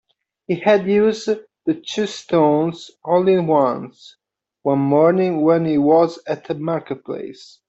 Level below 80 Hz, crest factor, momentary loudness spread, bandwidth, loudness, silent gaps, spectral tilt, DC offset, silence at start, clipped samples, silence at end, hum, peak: -62 dBFS; 14 dB; 13 LU; 8 kHz; -18 LUFS; none; -7 dB/octave; under 0.1%; 0.5 s; under 0.1%; 0.25 s; none; -4 dBFS